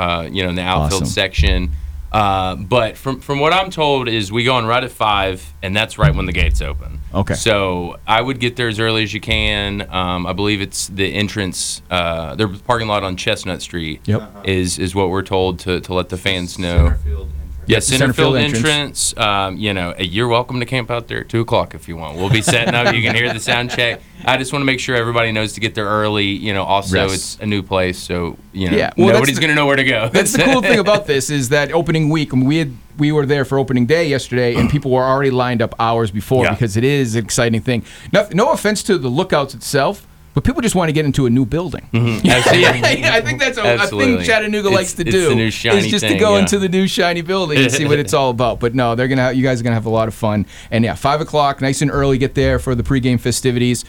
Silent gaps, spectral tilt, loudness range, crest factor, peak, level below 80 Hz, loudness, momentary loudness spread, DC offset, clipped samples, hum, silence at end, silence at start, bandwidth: none; -4.5 dB/octave; 5 LU; 14 dB; -2 dBFS; -30 dBFS; -16 LUFS; 8 LU; under 0.1%; under 0.1%; none; 0 s; 0 s; 19.5 kHz